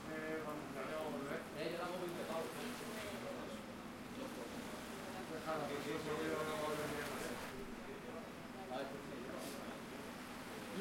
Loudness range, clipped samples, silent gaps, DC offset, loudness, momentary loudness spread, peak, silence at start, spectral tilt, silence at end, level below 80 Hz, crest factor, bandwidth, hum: 4 LU; under 0.1%; none; under 0.1%; -45 LUFS; 8 LU; -30 dBFS; 0 s; -4.5 dB/octave; 0 s; -68 dBFS; 16 dB; 16.5 kHz; none